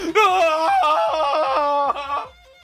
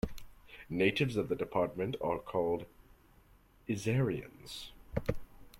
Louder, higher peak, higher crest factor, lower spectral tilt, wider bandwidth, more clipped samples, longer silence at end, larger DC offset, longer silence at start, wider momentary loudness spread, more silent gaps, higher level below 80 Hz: first, -19 LUFS vs -35 LUFS; first, -4 dBFS vs -14 dBFS; second, 14 dB vs 22 dB; second, -2.5 dB/octave vs -6.5 dB/octave; about the same, 15.5 kHz vs 16.5 kHz; neither; first, 0.35 s vs 0 s; neither; about the same, 0 s vs 0.05 s; second, 11 LU vs 18 LU; neither; about the same, -54 dBFS vs -54 dBFS